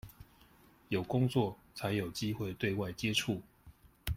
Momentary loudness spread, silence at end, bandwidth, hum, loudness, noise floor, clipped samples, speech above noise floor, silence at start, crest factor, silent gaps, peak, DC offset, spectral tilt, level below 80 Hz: 9 LU; 0 s; 16.5 kHz; none; -35 LUFS; -63 dBFS; under 0.1%; 28 dB; 0.05 s; 20 dB; none; -18 dBFS; under 0.1%; -5.5 dB/octave; -54 dBFS